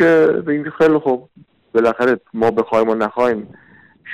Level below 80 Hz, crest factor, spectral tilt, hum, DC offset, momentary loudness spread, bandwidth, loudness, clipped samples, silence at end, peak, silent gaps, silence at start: -56 dBFS; 10 dB; -7 dB/octave; none; under 0.1%; 7 LU; 8.6 kHz; -17 LUFS; under 0.1%; 0 s; -6 dBFS; none; 0 s